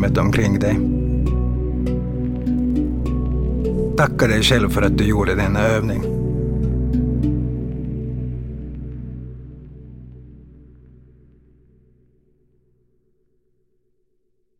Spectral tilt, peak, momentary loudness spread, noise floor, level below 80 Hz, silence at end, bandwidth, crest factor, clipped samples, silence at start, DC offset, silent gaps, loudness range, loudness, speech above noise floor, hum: -6.5 dB/octave; -2 dBFS; 17 LU; -69 dBFS; -28 dBFS; 4.1 s; 16.5 kHz; 20 dB; under 0.1%; 0 s; under 0.1%; none; 16 LU; -20 LUFS; 52 dB; none